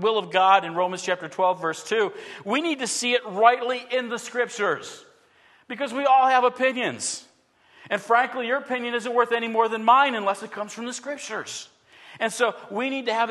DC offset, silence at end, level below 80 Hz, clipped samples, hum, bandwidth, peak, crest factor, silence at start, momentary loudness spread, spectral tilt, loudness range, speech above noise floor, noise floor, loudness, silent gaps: under 0.1%; 0 s; -80 dBFS; under 0.1%; none; 12.5 kHz; -4 dBFS; 20 dB; 0 s; 13 LU; -2.5 dB/octave; 2 LU; 36 dB; -59 dBFS; -23 LUFS; none